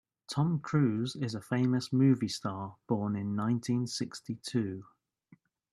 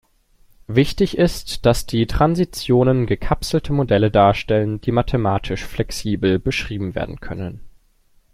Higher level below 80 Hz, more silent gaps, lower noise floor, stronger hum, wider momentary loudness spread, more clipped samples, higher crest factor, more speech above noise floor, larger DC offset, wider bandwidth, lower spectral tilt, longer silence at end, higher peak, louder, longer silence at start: second, -72 dBFS vs -34 dBFS; neither; first, -64 dBFS vs -56 dBFS; neither; about the same, 11 LU vs 10 LU; neither; about the same, 16 dB vs 18 dB; second, 33 dB vs 38 dB; neither; second, 12.5 kHz vs 15.5 kHz; about the same, -6.5 dB/octave vs -6.5 dB/octave; first, 0.9 s vs 0.65 s; second, -16 dBFS vs -2 dBFS; second, -32 LUFS vs -19 LUFS; second, 0.3 s vs 0.7 s